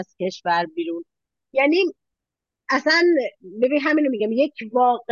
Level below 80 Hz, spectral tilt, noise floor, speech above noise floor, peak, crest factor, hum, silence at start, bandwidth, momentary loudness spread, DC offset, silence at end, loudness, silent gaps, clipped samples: -78 dBFS; -4.5 dB/octave; -86 dBFS; 66 dB; -6 dBFS; 16 dB; none; 0 s; 7.2 kHz; 12 LU; under 0.1%; 0 s; -21 LUFS; none; under 0.1%